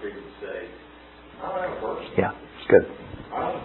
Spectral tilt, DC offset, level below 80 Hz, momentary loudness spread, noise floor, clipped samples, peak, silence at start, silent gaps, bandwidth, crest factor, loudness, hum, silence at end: -10.5 dB/octave; under 0.1%; -54 dBFS; 22 LU; -47 dBFS; under 0.1%; -2 dBFS; 0 s; none; 4.2 kHz; 24 dB; -26 LUFS; none; 0 s